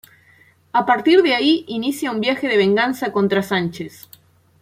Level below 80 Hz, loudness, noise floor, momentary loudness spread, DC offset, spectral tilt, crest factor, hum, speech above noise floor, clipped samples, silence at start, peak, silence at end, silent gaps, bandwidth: -64 dBFS; -18 LUFS; -53 dBFS; 9 LU; under 0.1%; -5 dB/octave; 16 dB; none; 35 dB; under 0.1%; 0.75 s; -2 dBFS; 0.75 s; none; 16 kHz